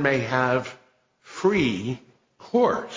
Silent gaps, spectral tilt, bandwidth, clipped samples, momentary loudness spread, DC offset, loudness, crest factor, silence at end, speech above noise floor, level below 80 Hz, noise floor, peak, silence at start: none; -6 dB/octave; 7.6 kHz; under 0.1%; 15 LU; under 0.1%; -24 LUFS; 18 dB; 0 s; 33 dB; -56 dBFS; -56 dBFS; -6 dBFS; 0 s